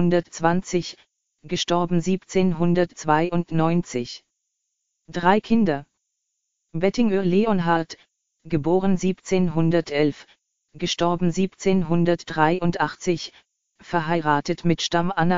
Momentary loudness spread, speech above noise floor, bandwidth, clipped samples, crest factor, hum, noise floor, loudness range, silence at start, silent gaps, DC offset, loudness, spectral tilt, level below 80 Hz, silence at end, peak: 9 LU; 56 dB; 7.6 kHz; under 0.1%; 20 dB; none; -78 dBFS; 2 LU; 0 s; none; 1%; -22 LUFS; -5.5 dB/octave; -50 dBFS; 0 s; -2 dBFS